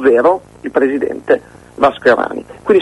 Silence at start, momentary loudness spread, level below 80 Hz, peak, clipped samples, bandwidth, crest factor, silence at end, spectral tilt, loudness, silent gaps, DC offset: 0 s; 9 LU; -48 dBFS; 0 dBFS; under 0.1%; 11.5 kHz; 14 dB; 0 s; -6 dB/octave; -15 LUFS; none; under 0.1%